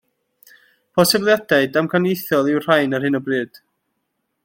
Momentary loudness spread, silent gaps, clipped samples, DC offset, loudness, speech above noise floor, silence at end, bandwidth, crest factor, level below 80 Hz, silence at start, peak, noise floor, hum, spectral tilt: 8 LU; none; under 0.1%; under 0.1%; -18 LUFS; 56 dB; 1 s; 16.5 kHz; 18 dB; -62 dBFS; 0.95 s; 0 dBFS; -73 dBFS; none; -4.5 dB/octave